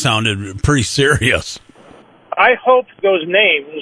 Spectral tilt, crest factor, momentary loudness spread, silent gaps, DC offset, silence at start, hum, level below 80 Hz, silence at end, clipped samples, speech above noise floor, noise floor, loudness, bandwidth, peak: -4 dB/octave; 14 dB; 8 LU; none; under 0.1%; 0 s; none; -34 dBFS; 0 s; under 0.1%; 29 dB; -43 dBFS; -14 LUFS; 11 kHz; 0 dBFS